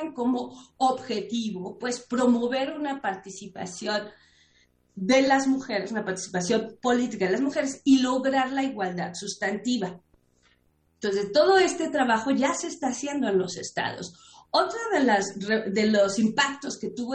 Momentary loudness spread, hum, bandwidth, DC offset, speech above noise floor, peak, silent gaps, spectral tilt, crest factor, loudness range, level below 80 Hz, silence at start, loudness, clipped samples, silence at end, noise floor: 11 LU; none; 9.8 kHz; under 0.1%; 41 dB; -8 dBFS; none; -4 dB/octave; 18 dB; 4 LU; -66 dBFS; 0 s; -26 LUFS; under 0.1%; 0 s; -66 dBFS